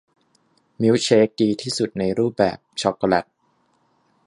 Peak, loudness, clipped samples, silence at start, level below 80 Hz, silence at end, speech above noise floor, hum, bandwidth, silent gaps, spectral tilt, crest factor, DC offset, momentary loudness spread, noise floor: -2 dBFS; -20 LUFS; under 0.1%; 0.8 s; -56 dBFS; 1.05 s; 45 dB; none; 11.5 kHz; none; -5 dB/octave; 20 dB; under 0.1%; 7 LU; -65 dBFS